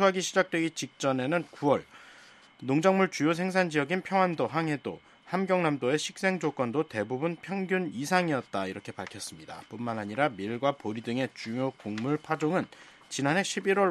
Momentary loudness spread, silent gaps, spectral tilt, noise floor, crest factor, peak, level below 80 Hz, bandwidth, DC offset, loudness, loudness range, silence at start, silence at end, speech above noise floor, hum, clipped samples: 11 LU; none; -5 dB/octave; -55 dBFS; 20 dB; -8 dBFS; -74 dBFS; 13.5 kHz; under 0.1%; -29 LUFS; 4 LU; 0 s; 0 s; 26 dB; none; under 0.1%